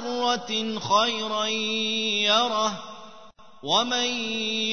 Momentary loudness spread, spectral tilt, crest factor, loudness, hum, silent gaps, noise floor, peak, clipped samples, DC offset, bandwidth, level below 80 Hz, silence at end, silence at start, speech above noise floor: 8 LU; -2 dB/octave; 18 dB; -24 LUFS; none; none; -49 dBFS; -8 dBFS; under 0.1%; 0.4%; 6.6 kHz; -66 dBFS; 0 s; 0 s; 24 dB